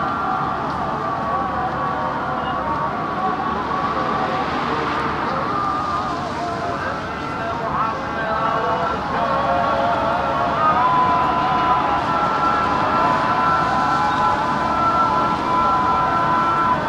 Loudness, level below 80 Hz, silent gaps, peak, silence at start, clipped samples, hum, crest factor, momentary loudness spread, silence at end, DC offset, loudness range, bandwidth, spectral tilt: -19 LUFS; -42 dBFS; none; -6 dBFS; 0 s; under 0.1%; none; 14 dB; 6 LU; 0 s; under 0.1%; 5 LU; 12 kHz; -6 dB/octave